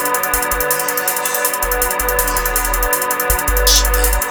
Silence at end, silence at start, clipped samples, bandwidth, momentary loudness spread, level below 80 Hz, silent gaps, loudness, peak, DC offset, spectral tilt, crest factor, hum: 0 s; 0 s; under 0.1%; over 20 kHz; 4 LU; -22 dBFS; none; -15 LUFS; 0 dBFS; under 0.1%; -1.5 dB/octave; 16 dB; none